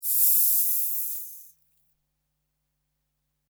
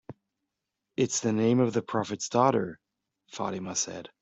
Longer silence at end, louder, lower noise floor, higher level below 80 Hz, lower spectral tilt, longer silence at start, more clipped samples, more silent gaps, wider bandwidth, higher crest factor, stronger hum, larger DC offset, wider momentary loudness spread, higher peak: first, 2.1 s vs 0.15 s; first, -20 LUFS vs -28 LUFS; second, -78 dBFS vs -85 dBFS; second, -84 dBFS vs -70 dBFS; second, 6 dB/octave vs -5 dB/octave; about the same, 0 s vs 0.1 s; neither; neither; first, over 20 kHz vs 8.2 kHz; about the same, 20 dB vs 20 dB; neither; neither; first, 16 LU vs 12 LU; about the same, -8 dBFS vs -10 dBFS